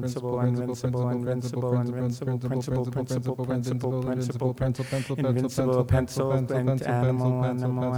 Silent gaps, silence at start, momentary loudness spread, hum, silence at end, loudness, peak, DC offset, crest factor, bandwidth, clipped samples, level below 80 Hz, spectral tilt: none; 0 s; 4 LU; none; 0 s; -27 LUFS; -12 dBFS; under 0.1%; 14 dB; 15.5 kHz; under 0.1%; -50 dBFS; -7.5 dB/octave